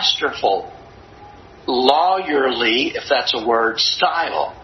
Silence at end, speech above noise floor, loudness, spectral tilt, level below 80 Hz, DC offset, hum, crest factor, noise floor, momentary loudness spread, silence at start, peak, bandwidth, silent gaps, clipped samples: 0 s; 23 dB; -17 LUFS; -2.5 dB/octave; -54 dBFS; under 0.1%; none; 18 dB; -41 dBFS; 7 LU; 0 s; 0 dBFS; 8.6 kHz; none; under 0.1%